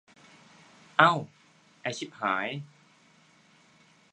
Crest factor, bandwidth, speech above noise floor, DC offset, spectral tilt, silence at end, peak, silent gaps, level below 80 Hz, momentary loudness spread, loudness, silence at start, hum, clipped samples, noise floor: 30 dB; 10 kHz; 34 dB; under 0.1%; -4.5 dB/octave; 1.5 s; -2 dBFS; none; -80 dBFS; 20 LU; -27 LUFS; 1 s; none; under 0.1%; -61 dBFS